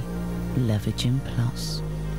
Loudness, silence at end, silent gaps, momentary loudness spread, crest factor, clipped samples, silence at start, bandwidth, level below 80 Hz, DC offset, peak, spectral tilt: -27 LUFS; 0 s; none; 5 LU; 14 dB; under 0.1%; 0 s; 16 kHz; -36 dBFS; 1%; -12 dBFS; -6 dB/octave